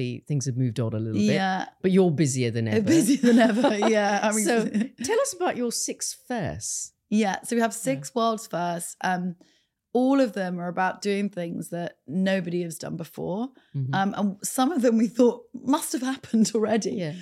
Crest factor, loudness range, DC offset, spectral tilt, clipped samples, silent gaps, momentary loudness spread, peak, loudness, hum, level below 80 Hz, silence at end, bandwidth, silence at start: 16 dB; 6 LU; under 0.1%; -5 dB/octave; under 0.1%; none; 11 LU; -8 dBFS; -25 LUFS; none; -66 dBFS; 0 s; 15 kHz; 0 s